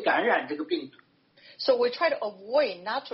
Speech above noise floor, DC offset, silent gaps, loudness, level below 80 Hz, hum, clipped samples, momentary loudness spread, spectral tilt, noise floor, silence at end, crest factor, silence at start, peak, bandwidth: 30 dB; under 0.1%; none; -27 LUFS; -80 dBFS; none; under 0.1%; 9 LU; -0.5 dB/octave; -57 dBFS; 0 s; 18 dB; 0 s; -10 dBFS; 5.8 kHz